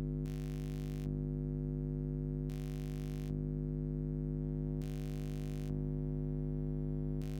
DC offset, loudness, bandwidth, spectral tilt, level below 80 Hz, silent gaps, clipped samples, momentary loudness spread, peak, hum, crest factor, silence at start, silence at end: under 0.1%; -40 LUFS; 16 kHz; -9 dB/octave; -44 dBFS; none; under 0.1%; 2 LU; -26 dBFS; 50 Hz at -40 dBFS; 12 dB; 0 s; 0 s